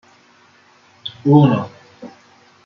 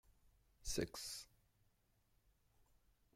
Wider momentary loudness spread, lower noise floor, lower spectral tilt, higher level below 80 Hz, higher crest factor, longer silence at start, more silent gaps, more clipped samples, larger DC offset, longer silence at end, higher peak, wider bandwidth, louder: first, 27 LU vs 11 LU; second, -51 dBFS vs -79 dBFS; first, -9 dB/octave vs -3 dB/octave; about the same, -60 dBFS vs -62 dBFS; second, 18 dB vs 24 dB; first, 1.05 s vs 0.1 s; neither; neither; neither; second, 0.6 s vs 1.9 s; first, -2 dBFS vs -28 dBFS; second, 6.4 kHz vs 16 kHz; first, -15 LUFS vs -47 LUFS